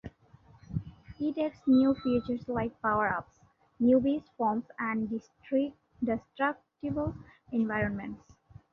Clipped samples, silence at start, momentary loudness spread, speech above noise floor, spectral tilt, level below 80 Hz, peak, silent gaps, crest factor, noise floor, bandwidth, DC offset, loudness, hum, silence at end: under 0.1%; 0.05 s; 14 LU; 29 dB; -9 dB/octave; -56 dBFS; -14 dBFS; none; 18 dB; -59 dBFS; 6.2 kHz; under 0.1%; -31 LUFS; none; 0.55 s